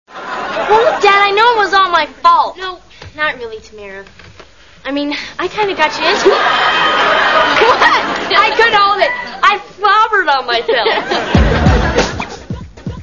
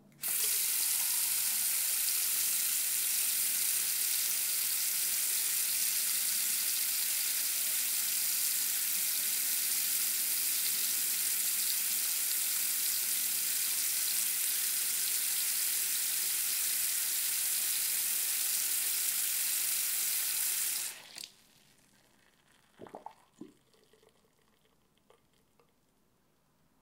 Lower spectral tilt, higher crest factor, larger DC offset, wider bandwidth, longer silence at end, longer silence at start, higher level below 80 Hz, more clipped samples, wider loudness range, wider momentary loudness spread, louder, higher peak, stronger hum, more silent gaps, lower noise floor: first, -4.5 dB/octave vs 3 dB/octave; second, 12 dB vs 18 dB; first, 0.5% vs under 0.1%; second, 7.6 kHz vs 16 kHz; second, 0 s vs 3.35 s; about the same, 0.1 s vs 0.2 s; first, -28 dBFS vs -82 dBFS; neither; first, 8 LU vs 3 LU; first, 17 LU vs 1 LU; first, -11 LUFS vs -29 LUFS; first, 0 dBFS vs -16 dBFS; neither; neither; second, -40 dBFS vs -72 dBFS